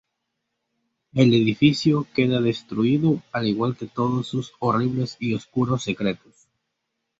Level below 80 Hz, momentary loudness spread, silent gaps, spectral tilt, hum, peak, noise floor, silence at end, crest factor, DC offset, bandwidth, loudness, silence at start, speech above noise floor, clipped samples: -58 dBFS; 8 LU; none; -7 dB/octave; none; -4 dBFS; -79 dBFS; 1.05 s; 20 dB; under 0.1%; 8 kHz; -22 LUFS; 1.15 s; 57 dB; under 0.1%